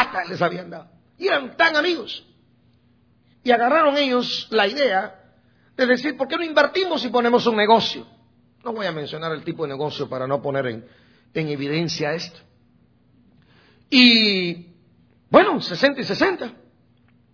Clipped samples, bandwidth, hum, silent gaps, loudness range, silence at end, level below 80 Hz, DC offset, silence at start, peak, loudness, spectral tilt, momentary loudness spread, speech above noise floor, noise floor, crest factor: under 0.1%; 5.4 kHz; none; none; 9 LU; 0.8 s; -62 dBFS; under 0.1%; 0 s; 0 dBFS; -20 LUFS; -5 dB/octave; 16 LU; 39 dB; -59 dBFS; 22 dB